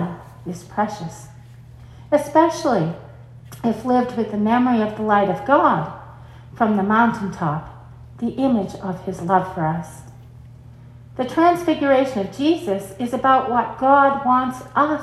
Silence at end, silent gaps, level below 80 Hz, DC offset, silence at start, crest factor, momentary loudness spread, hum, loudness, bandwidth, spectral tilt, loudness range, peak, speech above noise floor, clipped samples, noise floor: 0 s; none; -52 dBFS; under 0.1%; 0 s; 20 dB; 16 LU; none; -19 LUFS; 13 kHz; -6.5 dB/octave; 5 LU; 0 dBFS; 23 dB; under 0.1%; -42 dBFS